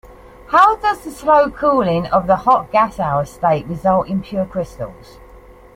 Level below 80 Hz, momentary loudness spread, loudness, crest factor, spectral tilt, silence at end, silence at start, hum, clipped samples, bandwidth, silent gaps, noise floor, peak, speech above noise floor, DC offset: -42 dBFS; 10 LU; -16 LUFS; 16 dB; -7 dB/octave; 0.85 s; 0.05 s; none; under 0.1%; 16 kHz; none; -42 dBFS; 0 dBFS; 26 dB; under 0.1%